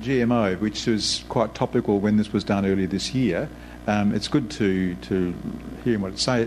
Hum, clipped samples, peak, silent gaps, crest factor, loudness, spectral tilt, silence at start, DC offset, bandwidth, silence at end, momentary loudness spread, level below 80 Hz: none; under 0.1%; -6 dBFS; none; 16 dB; -24 LUFS; -5.5 dB/octave; 0 s; under 0.1%; 13 kHz; 0 s; 7 LU; -46 dBFS